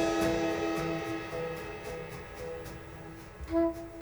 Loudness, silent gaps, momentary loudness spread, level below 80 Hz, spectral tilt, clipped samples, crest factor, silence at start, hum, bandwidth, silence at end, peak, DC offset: -34 LUFS; none; 16 LU; -52 dBFS; -5.5 dB/octave; under 0.1%; 16 dB; 0 s; none; over 20 kHz; 0 s; -18 dBFS; under 0.1%